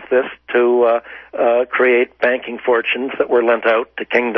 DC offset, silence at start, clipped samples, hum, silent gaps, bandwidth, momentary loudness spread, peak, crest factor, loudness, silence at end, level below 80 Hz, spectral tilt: under 0.1%; 0 s; under 0.1%; none; none; 5.8 kHz; 6 LU; -2 dBFS; 16 dB; -16 LUFS; 0 s; -60 dBFS; -6 dB/octave